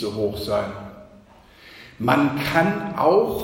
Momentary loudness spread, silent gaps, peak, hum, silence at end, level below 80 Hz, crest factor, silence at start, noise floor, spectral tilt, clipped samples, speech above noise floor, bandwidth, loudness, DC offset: 21 LU; none; -4 dBFS; none; 0 s; -50 dBFS; 20 dB; 0 s; -49 dBFS; -6.5 dB/octave; under 0.1%; 28 dB; 16.5 kHz; -21 LUFS; under 0.1%